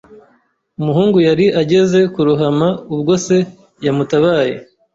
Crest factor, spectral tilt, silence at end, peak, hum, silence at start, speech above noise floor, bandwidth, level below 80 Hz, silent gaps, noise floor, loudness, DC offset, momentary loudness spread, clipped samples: 12 dB; -6.5 dB/octave; 0.3 s; -2 dBFS; none; 0.1 s; 44 dB; 8 kHz; -52 dBFS; none; -57 dBFS; -14 LUFS; under 0.1%; 8 LU; under 0.1%